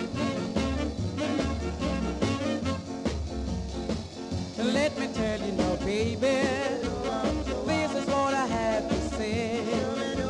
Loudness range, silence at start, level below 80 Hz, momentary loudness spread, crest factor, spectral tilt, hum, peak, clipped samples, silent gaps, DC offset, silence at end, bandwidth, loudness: 3 LU; 0 s; -40 dBFS; 7 LU; 16 dB; -5.5 dB/octave; none; -14 dBFS; under 0.1%; none; under 0.1%; 0 s; 11.5 kHz; -29 LUFS